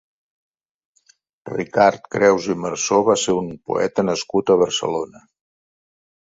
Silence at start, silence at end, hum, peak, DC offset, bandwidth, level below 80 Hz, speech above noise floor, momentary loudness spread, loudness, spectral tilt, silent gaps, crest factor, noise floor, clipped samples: 1.45 s; 1.15 s; none; -2 dBFS; under 0.1%; 8 kHz; -58 dBFS; 41 dB; 9 LU; -19 LUFS; -4 dB/octave; none; 18 dB; -59 dBFS; under 0.1%